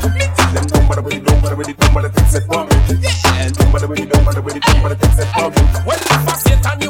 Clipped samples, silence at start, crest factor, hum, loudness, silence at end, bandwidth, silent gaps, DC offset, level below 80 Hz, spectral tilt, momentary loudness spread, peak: under 0.1%; 0 s; 12 dB; none; -14 LUFS; 0 s; 18 kHz; none; under 0.1%; -16 dBFS; -5 dB/octave; 3 LU; 0 dBFS